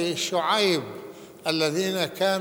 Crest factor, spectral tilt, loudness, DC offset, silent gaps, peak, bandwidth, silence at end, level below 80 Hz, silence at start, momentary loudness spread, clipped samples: 20 dB; -3.5 dB/octave; -24 LUFS; under 0.1%; none; -6 dBFS; over 20 kHz; 0 s; -70 dBFS; 0 s; 17 LU; under 0.1%